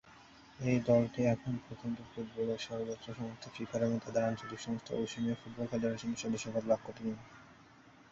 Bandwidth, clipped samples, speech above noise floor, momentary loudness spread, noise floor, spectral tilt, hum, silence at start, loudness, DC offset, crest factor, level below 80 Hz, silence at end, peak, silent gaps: 8 kHz; under 0.1%; 24 dB; 12 LU; -60 dBFS; -6.5 dB/octave; none; 0.05 s; -36 LUFS; under 0.1%; 20 dB; -66 dBFS; 0.2 s; -16 dBFS; none